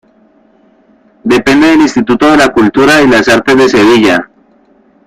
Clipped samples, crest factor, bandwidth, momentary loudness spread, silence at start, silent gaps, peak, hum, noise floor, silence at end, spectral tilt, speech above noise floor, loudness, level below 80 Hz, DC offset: 0.1%; 8 dB; 15 kHz; 4 LU; 1.25 s; none; 0 dBFS; none; -46 dBFS; 0.8 s; -4.5 dB/octave; 40 dB; -6 LUFS; -40 dBFS; under 0.1%